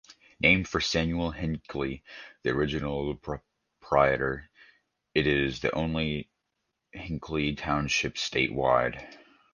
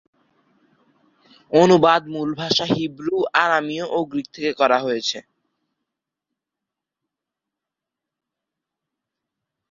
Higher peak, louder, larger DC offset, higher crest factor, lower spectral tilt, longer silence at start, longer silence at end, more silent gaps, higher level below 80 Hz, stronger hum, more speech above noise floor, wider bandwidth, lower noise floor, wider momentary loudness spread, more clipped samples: second, -6 dBFS vs -2 dBFS; second, -28 LUFS vs -19 LUFS; neither; about the same, 22 dB vs 22 dB; about the same, -5 dB/octave vs -5 dB/octave; second, 0.1 s vs 1.5 s; second, 0.35 s vs 4.5 s; neither; first, -46 dBFS vs -64 dBFS; neither; second, 53 dB vs 66 dB; first, 10 kHz vs 7.6 kHz; second, -81 dBFS vs -85 dBFS; first, 15 LU vs 12 LU; neither